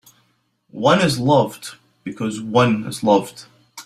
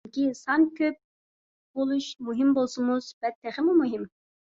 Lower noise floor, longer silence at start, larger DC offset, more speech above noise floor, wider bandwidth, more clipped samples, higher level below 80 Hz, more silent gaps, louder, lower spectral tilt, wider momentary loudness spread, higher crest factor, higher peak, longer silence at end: second, -64 dBFS vs under -90 dBFS; first, 0.75 s vs 0.05 s; neither; second, 46 dB vs over 64 dB; first, 15 kHz vs 7.8 kHz; neither; first, -56 dBFS vs -72 dBFS; second, none vs 1.04-1.74 s, 3.14-3.21 s, 3.35-3.42 s; first, -18 LUFS vs -26 LUFS; about the same, -5.5 dB/octave vs -4.5 dB/octave; first, 19 LU vs 11 LU; about the same, 18 dB vs 16 dB; first, -2 dBFS vs -12 dBFS; second, 0.05 s vs 0.45 s